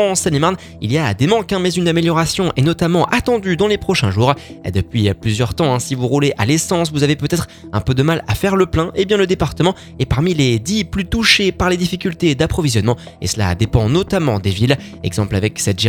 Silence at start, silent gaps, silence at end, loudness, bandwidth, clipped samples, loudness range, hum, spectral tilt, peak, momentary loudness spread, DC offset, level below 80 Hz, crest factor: 0 s; none; 0 s; -16 LUFS; 18.5 kHz; under 0.1%; 1 LU; none; -5 dB/octave; 0 dBFS; 5 LU; under 0.1%; -34 dBFS; 16 dB